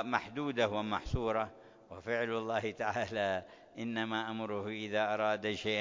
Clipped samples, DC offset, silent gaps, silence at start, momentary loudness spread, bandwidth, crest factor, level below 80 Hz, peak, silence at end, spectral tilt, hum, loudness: under 0.1%; under 0.1%; none; 0 s; 7 LU; 7.6 kHz; 22 dB; -54 dBFS; -14 dBFS; 0 s; -5.5 dB/octave; none; -35 LUFS